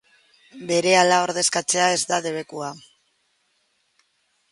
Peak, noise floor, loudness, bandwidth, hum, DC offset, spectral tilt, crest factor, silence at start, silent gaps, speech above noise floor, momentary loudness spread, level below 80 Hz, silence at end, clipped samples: -2 dBFS; -68 dBFS; -20 LUFS; 11.5 kHz; none; under 0.1%; -2 dB/octave; 22 dB; 0.55 s; none; 47 dB; 16 LU; -72 dBFS; 1.75 s; under 0.1%